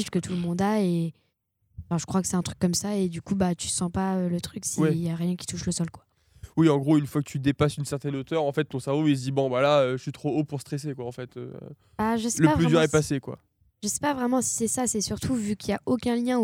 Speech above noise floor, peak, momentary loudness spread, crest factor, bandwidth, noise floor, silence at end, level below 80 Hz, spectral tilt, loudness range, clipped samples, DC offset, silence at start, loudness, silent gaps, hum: 46 dB; -6 dBFS; 11 LU; 20 dB; 16.5 kHz; -71 dBFS; 0 s; -54 dBFS; -5.5 dB/octave; 3 LU; under 0.1%; under 0.1%; 0 s; -26 LUFS; none; none